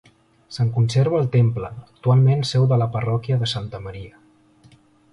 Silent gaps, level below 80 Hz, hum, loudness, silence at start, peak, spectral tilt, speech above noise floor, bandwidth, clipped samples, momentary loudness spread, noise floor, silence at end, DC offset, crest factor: none; -50 dBFS; none; -20 LUFS; 0.5 s; -6 dBFS; -7 dB/octave; 34 dB; 11 kHz; under 0.1%; 17 LU; -53 dBFS; 1.05 s; under 0.1%; 14 dB